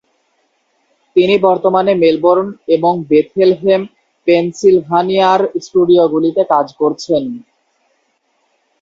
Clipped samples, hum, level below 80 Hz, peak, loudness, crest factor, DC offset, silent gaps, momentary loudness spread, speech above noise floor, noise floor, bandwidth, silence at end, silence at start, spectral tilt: under 0.1%; none; -56 dBFS; 0 dBFS; -13 LUFS; 14 dB; under 0.1%; none; 6 LU; 50 dB; -62 dBFS; 7.6 kHz; 1.4 s; 1.15 s; -6.5 dB/octave